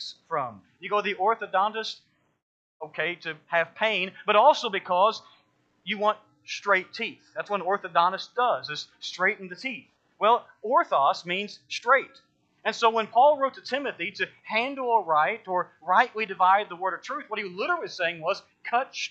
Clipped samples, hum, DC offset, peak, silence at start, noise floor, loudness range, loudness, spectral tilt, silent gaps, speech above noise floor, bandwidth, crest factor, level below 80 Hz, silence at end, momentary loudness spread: under 0.1%; none; under 0.1%; -6 dBFS; 0 s; -66 dBFS; 3 LU; -26 LUFS; -3.5 dB/octave; 2.42-2.80 s; 40 dB; 8.2 kHz; 20 dB; -86 dBFS; 0 s; 12 LU